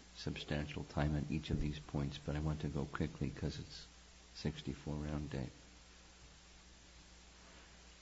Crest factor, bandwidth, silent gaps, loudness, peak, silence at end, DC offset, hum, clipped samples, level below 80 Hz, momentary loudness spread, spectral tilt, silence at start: 20 dB; 7.6 kHz; none; -42 LUFS; -22 dBFS; 0 s; under 0.1%; none; under 0.1%; -52 dBFS; 20 LU; -6 dB/octave; 0 s